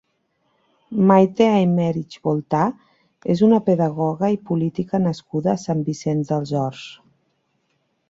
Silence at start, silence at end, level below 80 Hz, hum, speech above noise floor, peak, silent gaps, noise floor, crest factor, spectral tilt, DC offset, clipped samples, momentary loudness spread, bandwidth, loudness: 0.9 s; 1.15 s; -60 dBFS; none; 50 dB; -2 dBFS; none; -69 dBFS; 18 dB; -8 dB/octave; under 0.1%; under 0.1%; 9 LU; 7.8 kHz; -20 LUFS